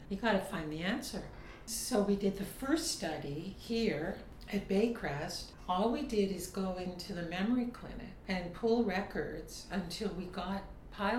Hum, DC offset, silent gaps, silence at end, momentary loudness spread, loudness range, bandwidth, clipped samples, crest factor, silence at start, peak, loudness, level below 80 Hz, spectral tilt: none; under 0.1%; none; 0 s; 10 LU; 1 LU; 16.5 kHz; under 0.1%; 18 dB; 0 s; -18 dBFS; -36 LUFS; -54 dBFS; -5 dB/octave